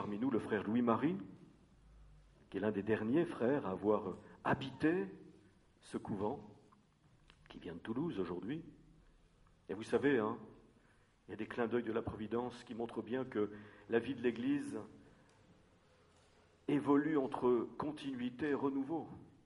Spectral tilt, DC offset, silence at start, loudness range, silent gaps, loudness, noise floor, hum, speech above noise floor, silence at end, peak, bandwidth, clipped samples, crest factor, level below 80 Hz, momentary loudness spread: -7.5 dB/octave; under 0.1%; 0 s; 7 LU; none; -38 LUFS; -70 dBFS; none; 32 dB; 0.15 s; -18 dBFS; 11 kHz; under 0.1%; 22 dB; -70 dBFS; 14 LU